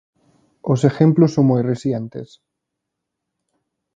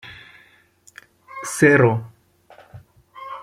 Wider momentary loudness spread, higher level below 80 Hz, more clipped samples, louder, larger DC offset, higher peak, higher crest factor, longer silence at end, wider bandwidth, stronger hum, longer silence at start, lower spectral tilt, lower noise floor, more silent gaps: second, 17 LU vs 26 LU; about the same, -58 dBFS vs -60 dBFS; neither; about the same, -17 LUFS vs -17 LUFS; neither; about the same, 0 dBFS vs -2 dBFS; about the same, 20 dB vs 22 dB; first, 1.7 s vs 0 s; second, 7.8 kHz vs 16 kHz; neither; first, 0.65 s vs 0.05 s; first, -8.5 dB/octave vs -6 dB/octave; first, -80 dBFS vs -55 dBFS; neither